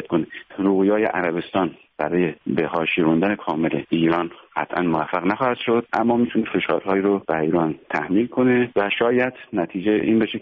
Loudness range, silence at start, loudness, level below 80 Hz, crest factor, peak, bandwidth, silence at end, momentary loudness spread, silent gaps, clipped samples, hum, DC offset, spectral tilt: 1 LU; 0 s; -21 LUFS; -56 dBFS; 14 dB; -6 dBFS; 5.4 kHz; 0 s; 6 LU; none; under 0.1%; none; under 0.1%; -5 dB/octave